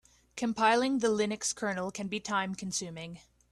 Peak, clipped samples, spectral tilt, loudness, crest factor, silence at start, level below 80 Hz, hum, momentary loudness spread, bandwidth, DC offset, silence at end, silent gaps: -12 dBFS; under 0.1%; -3.5 dB/octave; -31 LUFS; 20 dB; 0.35 s; -68 dBFS; none; 15 LU; 13 kHz; under 0.1%; 0.35 s; none